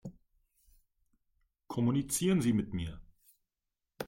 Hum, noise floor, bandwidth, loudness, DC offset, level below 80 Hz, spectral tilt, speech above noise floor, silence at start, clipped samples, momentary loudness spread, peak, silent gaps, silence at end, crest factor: none; -88 dBFS; 16.5 kHz; -32 LUFS; under 0.1%; -58 dBFS; -5.5 dB/octave; 57 dB; 0.05 s; under 0.1%; 14 LU; -18 dBFS; none; 0 s; 18 dB